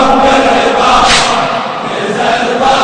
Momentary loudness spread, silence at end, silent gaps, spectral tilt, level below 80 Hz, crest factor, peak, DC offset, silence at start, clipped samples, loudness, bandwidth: 9 LU; 0 s; none; -3 dB/octave; -32 dBFS; 10 dB; 0 dBFS; under 0.1%; 0 s; 0.9%; -9 LUFS; 11 kHz